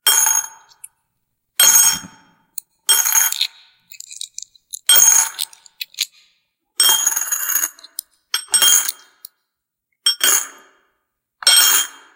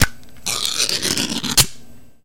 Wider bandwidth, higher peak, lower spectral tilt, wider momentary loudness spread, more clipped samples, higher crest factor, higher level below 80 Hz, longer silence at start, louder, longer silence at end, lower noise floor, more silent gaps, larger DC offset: about the same, 17.5 kHz vs 17 kHz; about the same, 0 dBFS vs 0 dBFS; second, 3.5 dB/octave vs -1.5 dB/octave; first, 22 LU vs 7 LU; neither; about the same, 18 dB vs 20 dB; second, -70 dBFS vs -36 dBFS; about the same, 0.05 s vs 0 s; first, -13 LUFS vs -18 LUFS; first, 0.25 s vs 0 s; first, -78 dBFS vs -41 dBFS; neither; second, under 0.1% vs 2%